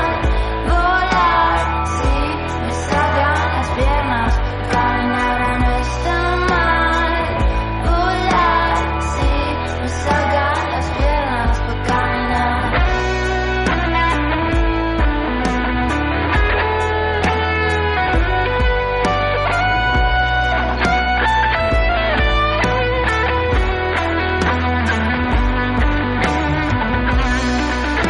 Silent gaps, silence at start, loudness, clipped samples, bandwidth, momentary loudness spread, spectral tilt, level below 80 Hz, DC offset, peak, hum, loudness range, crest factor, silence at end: none; 0 s; -17 LUFS; under 0.1%; 11 kHz; 4 LU; -5.5 dB/octave; -22 dBFS; under 0.1%; -4 dBFS; none; 2 LU; 12 dB; 0 s